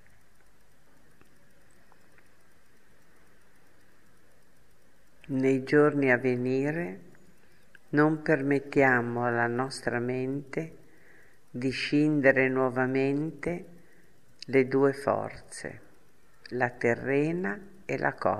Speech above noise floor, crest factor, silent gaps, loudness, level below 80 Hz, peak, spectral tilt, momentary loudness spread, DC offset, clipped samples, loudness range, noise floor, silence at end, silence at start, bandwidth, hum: 37 dB; 22 dB; none; -27 LUFS; -64 dBFS; -8 dBFS; -7 dB/octave; 16 LU; 0.3%; under 0.1%; 4 LU; -64 dBFS; 0 s; 5.3 s; 12.5 kHz; none